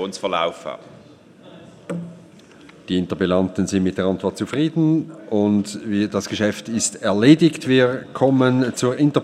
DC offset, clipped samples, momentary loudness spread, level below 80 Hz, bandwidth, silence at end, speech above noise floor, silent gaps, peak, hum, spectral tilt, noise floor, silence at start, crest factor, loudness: under 0.1%; under 0.1%; 12 LU; -58 dBFS; 13 kHz; 0 s; 27 dB; none; 0 dBFS; none; -5.5 dB/octave; -46 dBFS; 0 s; 20 dB; -19 LUFS